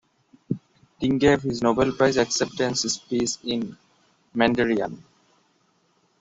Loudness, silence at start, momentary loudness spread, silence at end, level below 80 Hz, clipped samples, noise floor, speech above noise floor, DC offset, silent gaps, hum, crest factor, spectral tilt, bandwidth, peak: -23 LUFS; 0.5 s; 13 LU; 1.2 s; -52 dBFS; under 0.1%; -66 dBFS; 43 dB; under 0.1%; none; none; 22 dB; -4 dB/octave; 8.2 kHz; -4 dBFS